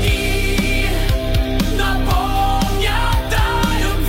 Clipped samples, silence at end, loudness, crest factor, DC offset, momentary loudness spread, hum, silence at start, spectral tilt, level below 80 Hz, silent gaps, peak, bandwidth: under 0.1%; 0 s; -18 LUFS; 10 dB; 0.2%; 1 LU; none; 0 s; -5 dB/octave; -18 dBFS; none; -6 dBFS; 16.5 kHz